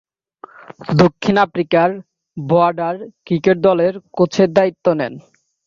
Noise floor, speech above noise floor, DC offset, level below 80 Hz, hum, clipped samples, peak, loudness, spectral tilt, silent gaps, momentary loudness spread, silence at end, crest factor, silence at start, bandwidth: -42 dBFS; 27 dB; under 0.1%; -54 dBFS; none; under 0.1%; 0 dBFS; -16 LUFS; -7 dB/octave; none; 14 LU; 0.45 s; 16 dB; 0.7 s; 7.4 kHz